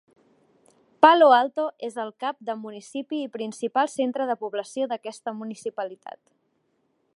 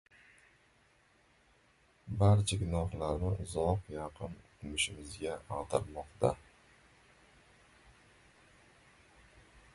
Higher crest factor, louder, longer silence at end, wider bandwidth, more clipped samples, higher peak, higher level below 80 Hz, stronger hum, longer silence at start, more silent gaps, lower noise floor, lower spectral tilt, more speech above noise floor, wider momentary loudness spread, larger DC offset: about the same, 24 dB vs 22 dB; first, -24 LUFS vs -35 LUFS; second, 1.05 s vs 3.35 s; about the same, 11.5 kHz vs 11.5 kHz; neither; first, 0 dBFS vs -14 dBFS; second, -78 dBFS vs -50 dBFS; neither; second, 1 s vs 2.05 s; neither; about the same, -71 dBFS vs -68 dBFS; second, -3.5 dB/octave vs -5.5 dB/octave; first, 47 dB vs 35 dB; about the same, 18 LU vs 17 LU; neither